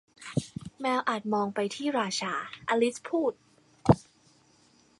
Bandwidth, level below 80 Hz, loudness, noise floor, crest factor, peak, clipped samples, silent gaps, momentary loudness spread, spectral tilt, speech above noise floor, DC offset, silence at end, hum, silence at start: 11.5 kHz; -54 dBFS; -30 LUFS; -63 dBFS; 24 dB; -6 dBFS; under 0.1%; none; 8 LU; -5.5 dB/octave; 33 dB; under 0.1%; 1 s; none; 0.2 s